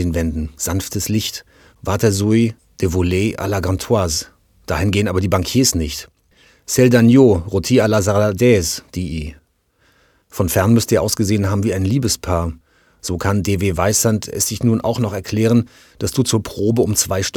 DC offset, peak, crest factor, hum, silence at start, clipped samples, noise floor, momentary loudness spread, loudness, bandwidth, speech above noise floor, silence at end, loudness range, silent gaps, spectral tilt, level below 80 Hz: under 0.1%; 0 dBFS; 16 dB; none; 0 s; under 0.1%; -59 dBFS; 11 LU; -17 LUFS; 19 kHz; 43 dB; 0 s; 4 LU; none; -5 dB/octave; -36 dBFS